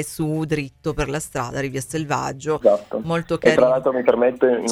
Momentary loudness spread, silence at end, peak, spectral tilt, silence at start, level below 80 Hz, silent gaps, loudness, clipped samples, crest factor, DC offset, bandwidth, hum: 9 LU; 0 s; 0 dBFS; -5.5 dB/octave; 0 s; -44 dBFS; none; -21 LUFS; under 0.1%; 20 dB; under 0.1%; 15 kHz; none